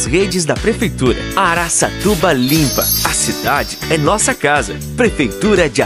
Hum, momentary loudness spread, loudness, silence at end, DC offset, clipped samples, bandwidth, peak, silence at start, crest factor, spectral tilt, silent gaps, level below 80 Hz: none; 4 LU; -14 LUFS; 0 s; under 0.1%; under 0.1%; 16 kHz; 0 dBFS; 0 s; 14 dB; -3.5 dB/octave; none; -30 dBFS